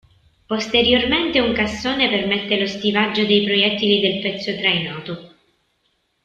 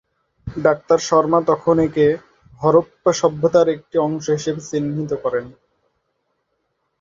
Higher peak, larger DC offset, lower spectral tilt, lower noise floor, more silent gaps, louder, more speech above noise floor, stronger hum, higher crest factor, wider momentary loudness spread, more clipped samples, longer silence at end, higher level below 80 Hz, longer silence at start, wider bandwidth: about the same, -2 dBFS vs -2 dBFS; neither; second, -4.5 dB/octave vs -6 dB/octave; second, -67 dBFS vs -71 dBFS; neither; about the same, -18 LUFS vs -18 LUFS; second, 48 dB vs 54 dB; neither; about the same, 18 dB vs 18 dB; about the same, 10 LU vs 8 LU; neither; second, 1 s vs 1.5 s; about the same, -48 dBFS vs -50 dBFS; about the same, 0.5 s vs 0.45 s; about the same, 7.8 kHz vs 7.6 kHz